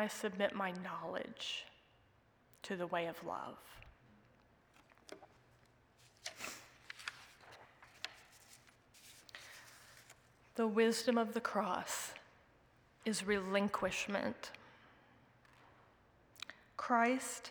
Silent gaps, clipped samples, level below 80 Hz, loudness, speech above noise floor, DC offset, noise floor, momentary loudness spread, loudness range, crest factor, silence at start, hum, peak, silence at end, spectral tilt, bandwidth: none; under 0.1%; -76 dBFS; -39 LUFS; 32 dB; under 0.1%; -71 dBFS; 25 LU; 15 LU; 24 dB; 0 s; none; -18 dBFS; 0 s; -3.5 dB/octave; over 20 kHz